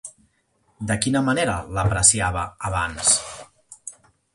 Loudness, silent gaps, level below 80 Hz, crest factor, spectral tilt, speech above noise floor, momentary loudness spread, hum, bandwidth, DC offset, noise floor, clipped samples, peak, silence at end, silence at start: -20 LUFS; none; -40 dBFS; 22 dB; -3 dB/octave; 44 dB; 23 LU; none; 11.5 kHz; under 0.1%; -66 dBFS; under 0.1%; -2 dBFS; 0.45 s; 0.05 s